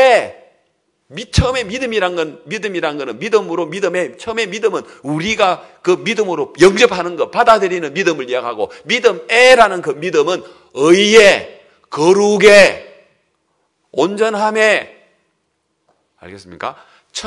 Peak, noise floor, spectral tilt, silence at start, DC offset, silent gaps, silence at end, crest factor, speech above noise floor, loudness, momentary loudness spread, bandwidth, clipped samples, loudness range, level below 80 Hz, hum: 0 dBFS; -67 dBFS; -4 dB/octave; 0 s; under 0.1%; none; 0 s; 14 dB; 54 dB; -13 LUFS; 16 LU; 12 kHz; 0.7%; 8 LU; -40 dBFS; none